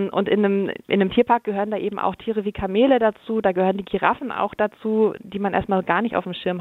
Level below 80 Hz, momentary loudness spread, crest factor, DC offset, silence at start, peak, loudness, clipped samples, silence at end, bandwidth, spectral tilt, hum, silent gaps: -52 dBFS; 7 LU; 18 dB; under 0.1%; 0 s; -2 dBFS; -22 LUFS; under 0.1%; 0 s; 4.2 kHz; -8.5 dB/octave; none; none